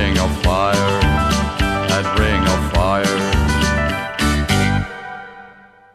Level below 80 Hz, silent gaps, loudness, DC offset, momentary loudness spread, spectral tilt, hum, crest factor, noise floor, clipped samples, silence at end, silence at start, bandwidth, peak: -24 dBFS; none; -17 LUFS; under 0.1%; 6 LU; -5 dB/octave; none; 14 dB; -44 dBFS; under 0.1%; 0.4 s; 0 s; 14 kHz; -2 dBFS